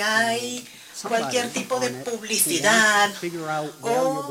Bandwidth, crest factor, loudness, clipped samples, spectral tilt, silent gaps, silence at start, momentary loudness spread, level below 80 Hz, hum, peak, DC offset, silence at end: 16.5 kHz; 18 dB; -22 LUFS; under 0.1%; -2 dB/octave; none; 0 s; 14 LU; -70 dBFS; none; -4 dBFS; under 0.1%; 0 s